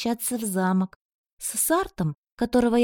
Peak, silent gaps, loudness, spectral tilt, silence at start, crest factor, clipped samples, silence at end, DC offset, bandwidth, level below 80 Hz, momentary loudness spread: -8 dBFS; 0.96-1.37 s, 2.17-2.23 s, 2.32-2.37 s; -25 LUFS; -5 dB/octave; 0 s; 16 dB; under 0.1%; 0 s; under 0.1%; 17.5 kHz; -52 dBFS; 8 LU